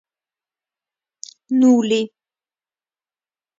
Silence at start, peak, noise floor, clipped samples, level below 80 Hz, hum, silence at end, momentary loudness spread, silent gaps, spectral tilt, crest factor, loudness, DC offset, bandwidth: 1.5 s; -4 dBFS; under -90 dBFS; under 0.1%; -72 dBFS; none; 1.55 s; 24 LU; none; -5 dB/octave; 18 dB; -17 LUFS; under 0.1%; 7.6 kHz